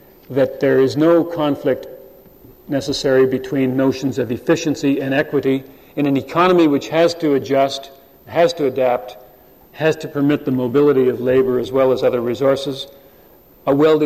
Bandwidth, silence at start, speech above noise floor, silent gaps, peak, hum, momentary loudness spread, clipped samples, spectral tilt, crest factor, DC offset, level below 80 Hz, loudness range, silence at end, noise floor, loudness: 15 kHz; 0.3 s; 31 dB; none; -4 dBFS; none; 9 LU; under 0.1%; -6 dB/octave; 14 dB; under 0.1%; -52 dBFS; 3 LU; 0 s; -47 dBFS; -17 LUFS